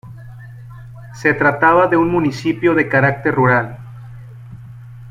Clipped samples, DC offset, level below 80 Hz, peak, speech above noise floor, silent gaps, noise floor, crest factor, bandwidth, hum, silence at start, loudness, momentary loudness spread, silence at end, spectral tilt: under 0.1%; under 0.1%; -48 dBFS; 0 dBFS; 21 dB; none; -35 dBFS; 16 dB; 10.5 kHz; none; 0.05 s; -15 LUFS; 24 LU; 0 s; -7.5 dB/octave